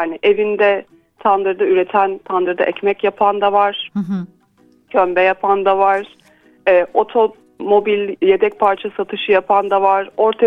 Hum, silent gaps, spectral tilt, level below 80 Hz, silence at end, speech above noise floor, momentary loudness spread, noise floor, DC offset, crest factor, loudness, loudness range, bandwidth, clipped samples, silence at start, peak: none; none; -7 dB/octave; -60 dBFS; 0 s; 38 dB; 8 LU; -53 dBFS; under 0.1%; 16 dB; -16 LUFS; 2 LU; 5 kHz; under 0.1%; 0 s; 0 dBFS